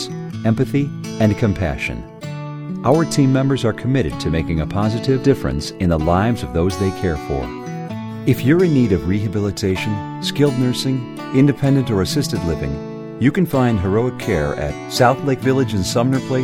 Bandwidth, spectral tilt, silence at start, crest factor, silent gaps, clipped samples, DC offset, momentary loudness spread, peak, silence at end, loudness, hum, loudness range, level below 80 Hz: 17 kHz; -6.5 dB/octave; 0 s; 18 dB; none; under 0.1%; under 0.1%; 9 LU; 0 dBFS; 0 s; -18 LUFS; none; 1 LU; -36 dBFS